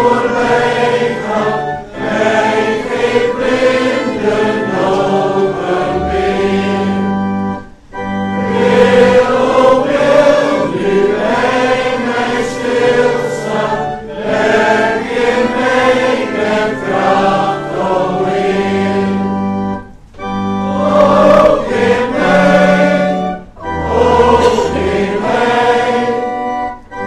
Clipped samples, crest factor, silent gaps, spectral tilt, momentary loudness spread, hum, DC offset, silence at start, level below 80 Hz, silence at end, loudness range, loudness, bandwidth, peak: under 0.1%; 12 dB; none; -6 dB/octave; 9 LU; none; under 0.1%; 0 s; -36 dBFS; 0 s; 4 LU; -12 LUFS; 11.5 kHz; 0 dBFS